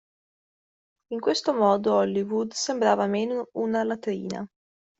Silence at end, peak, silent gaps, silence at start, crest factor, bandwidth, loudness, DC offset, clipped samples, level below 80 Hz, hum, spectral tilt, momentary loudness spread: 0.55 s; -8 dBFS; none; 1.1 s; 18 dB; 8.2 kHz; -25 LUFS; under 0.1%; under 0.1%; -70 dBFS; none; -4.5 dB/octave; 11 LU